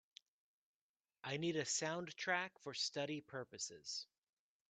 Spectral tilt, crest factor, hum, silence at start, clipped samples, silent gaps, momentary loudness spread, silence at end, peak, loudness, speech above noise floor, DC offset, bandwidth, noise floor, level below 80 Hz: -2.5 dB/octave; 22 dB; none; 1.25 s; under 0.1%; none; 9 LU; 0.65 s; -24 dBFS; -43 LUFS; over 46 dB; under 0.1%; 9 kHz; under -90 dBFS; -88 dBFS